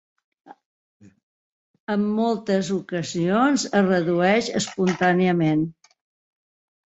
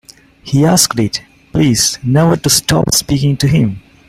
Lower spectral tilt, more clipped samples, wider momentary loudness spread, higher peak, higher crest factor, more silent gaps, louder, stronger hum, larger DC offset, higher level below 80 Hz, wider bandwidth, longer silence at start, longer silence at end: about the same, -5.5 dB/octave vs -4.5 dB/octave; neither; about the same, 7 LU vs 8 LU; second, -6 dBFS vs 0 dBFS; about the same, 18 dB vs 14 dB; first, 0.66-1.00 s, 1.23-1.74 s, 1.80-1.87 s vs none; second, -22 LUFS vs -12 LUFS; neither; neither; second, -64 dBFS vs -36 dBFS; second, 8.2 kHz vs 16.5 kHz; about the same, 0.5 s vs 0.45 s; first, 1.2 s vs 0.3 s